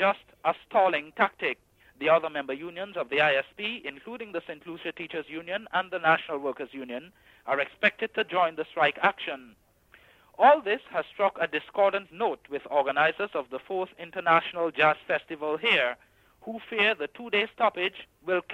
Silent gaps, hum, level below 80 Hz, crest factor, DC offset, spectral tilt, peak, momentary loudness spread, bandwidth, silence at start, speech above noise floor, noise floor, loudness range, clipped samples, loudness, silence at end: none; none; -70 dBFS; 20 dB; under 0.1%; -5.5 dB/octave; -8 dBFS; 13 LU; 9 kHz; 0 s; 32 dB; -59 dBFS; 5 LU; under 0.1%; -27 LUFS; 0 s